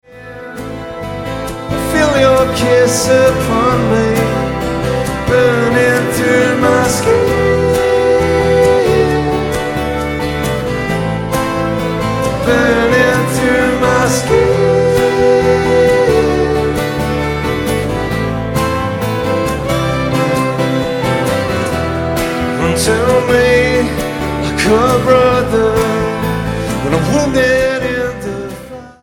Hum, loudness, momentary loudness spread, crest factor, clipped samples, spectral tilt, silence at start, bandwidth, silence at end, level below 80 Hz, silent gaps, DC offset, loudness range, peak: none; -13 LUFS; 7 LU; 12 dB; under 0.1%; -5.5 dB/octave; 0.1 s; 17.5 kHz; 0.1 s; -30 dBFS; none; under 0.1%; 4 LU; 0 dBFS